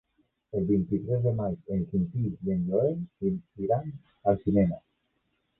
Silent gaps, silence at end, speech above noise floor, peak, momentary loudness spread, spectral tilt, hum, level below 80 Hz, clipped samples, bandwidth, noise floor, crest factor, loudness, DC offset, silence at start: none; 0.8 s; 48 dB; -10 dBFS; 7 LU; -13.5 dB/octave; none; -52 dBFS; under 0.1%; 2.7 kHz; -75 dBFS; 18 dB; -29 LUFS; under 0.1%; 0.55 s